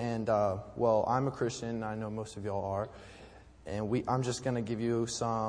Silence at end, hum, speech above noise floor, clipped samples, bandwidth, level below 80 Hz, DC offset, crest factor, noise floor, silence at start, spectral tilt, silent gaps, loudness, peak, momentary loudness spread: 0 s; none; 21 dB; under 0.1%; 10.5 kHz; -58 dBFS; under 0.1%; 18 dB; -54 dBFS; 0 s; -6 dB/octave; none; -33 LUFS; -14 dBFS; 12 LU